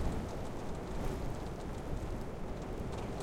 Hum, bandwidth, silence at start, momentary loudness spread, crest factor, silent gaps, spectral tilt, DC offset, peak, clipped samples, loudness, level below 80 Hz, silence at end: none; 16 kHz; 0 s; 3 LU; 16 dB; none; -6.5 dB/octave; under 0.1%; -22 dBFS; under 0.1%; -42 LUFS; -44 dBFS; 0 s